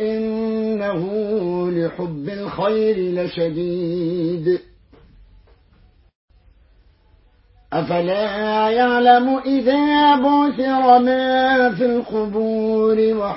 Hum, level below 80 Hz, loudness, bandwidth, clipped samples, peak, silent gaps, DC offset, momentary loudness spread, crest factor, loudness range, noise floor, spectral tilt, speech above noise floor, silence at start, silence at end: none; -52 dBFS; -18 LUFS; 5.8 kHz; under 0.1%; 0 dBFS; 6.15-6.28 s; under 0.1%; 9 LU; 18 dB; 12 LU; -54 dBFS; -10.5 dB/octave; 37 dB; 0 s; 0 s